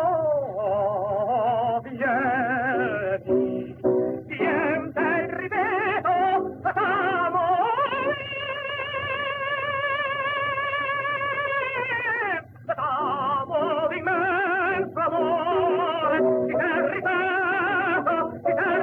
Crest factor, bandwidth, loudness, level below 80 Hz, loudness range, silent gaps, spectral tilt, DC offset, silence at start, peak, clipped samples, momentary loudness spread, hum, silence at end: 14 dB; 4.7 kHz; -24 LUFS; -62 dBFS; 2 LU; none; -7.5 dB/octave; under 0.1%; 0 s; -10 dBFS; under 0.1%; 4 LU; none; 0 s